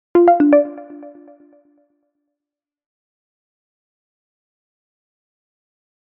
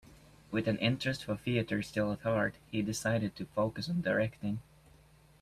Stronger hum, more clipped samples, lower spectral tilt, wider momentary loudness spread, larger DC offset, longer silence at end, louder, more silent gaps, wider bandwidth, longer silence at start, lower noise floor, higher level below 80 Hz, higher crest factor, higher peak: neither; neither; about the same, -6 dB/octave vs -5.5 dB/octave; first, 26 LU vs 6 LU; neither; first, 4.95 s vs 0.8 s; first, -14 LUFS vs -34 LUFS; neither; second, 3.3 kHz vs 14.5 kHz; about the same, 0.15 s vs 0.05 s; first, -87 dBFS vs -61 dBFS; about the same, -66 dBFS vs -62 dBFS; about the same, 22 dB vs 18 dB; first, 0 dBFS vs -16 dBFS